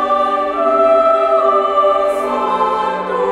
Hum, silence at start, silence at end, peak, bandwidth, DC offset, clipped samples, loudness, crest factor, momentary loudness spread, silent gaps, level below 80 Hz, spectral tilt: none; 0 s; 0 s; -2 dBFS; 12 kHz; under 0.1%; under 0.1%; -14 LUFS; 12 dB; 6 LU; none; -50 dBFS; -5 dB/octave